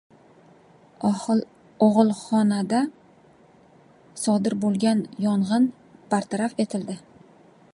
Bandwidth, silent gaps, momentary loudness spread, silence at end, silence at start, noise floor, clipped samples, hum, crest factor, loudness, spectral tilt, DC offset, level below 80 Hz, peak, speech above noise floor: 11.5 kHz; none; 9 LU; 0.75 s; 1 s; -54 dBFS; under 0.1%; none; 20 dB; -23 LUFS; -6 dB/octave; under 0.1%; -70 dBFS; -4 dBFS; 32 dB